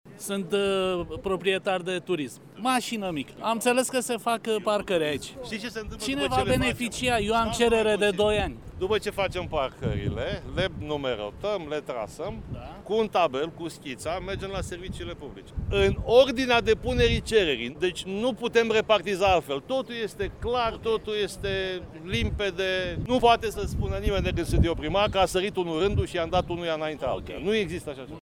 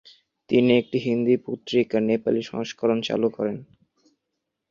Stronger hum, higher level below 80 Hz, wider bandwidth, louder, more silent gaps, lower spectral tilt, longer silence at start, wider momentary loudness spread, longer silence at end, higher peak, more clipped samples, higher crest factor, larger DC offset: neither; first, -40 dBFS vs -66 dBFS; first, 17.5 kHz vs 7.2 kHz; second, -26 LUFS vs -23 LUFS; neither; second, -4.5 dB/octave vs -6.5 dB/octave; second, 0.05 s vs 0.5 s; about the same, 11 LU vs 9 LU; second, 0.05 s vs 1.05 s; about the same, -6 dBFS vs -6 dBFS; neither; about the same, 20 dB vs 18 dB; neither